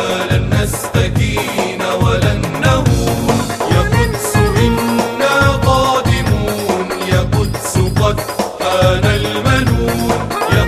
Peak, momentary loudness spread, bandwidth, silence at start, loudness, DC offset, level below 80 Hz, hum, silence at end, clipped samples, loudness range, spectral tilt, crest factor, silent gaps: 0 dBFS; 5 LU; 14 kHz; 0 s; -14 LUFS; 0.2%; -24 dBFS; none; 0 s; under 0.1%; 2 LU; -5.5 dB/octave; 14 dB; none